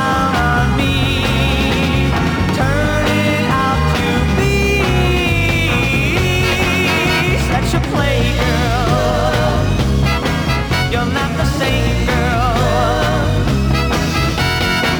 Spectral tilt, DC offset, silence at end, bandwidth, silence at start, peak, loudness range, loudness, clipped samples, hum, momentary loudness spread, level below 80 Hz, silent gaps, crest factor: -5.5 dB/octave; under 0.1%; 0 s; over 20 kHz; 0 s; -2 dBFS; 2 LU; -15 LUFS; under 0.1%; none; 2 LU; -22 dBFS; none; 12 dB